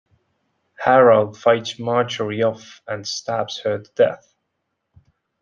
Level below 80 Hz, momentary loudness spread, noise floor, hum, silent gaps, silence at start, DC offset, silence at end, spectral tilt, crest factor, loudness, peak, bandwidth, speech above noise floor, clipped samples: -66 dBFS; 14 LU; -76 dBFS; none; none; 0.8 s; under 0.1%; 1.25 s; -5 dB/octave; 18 dB; -19 LUFS; -2 dBFS; 7.4 kHz; 57 dB; under 0.1%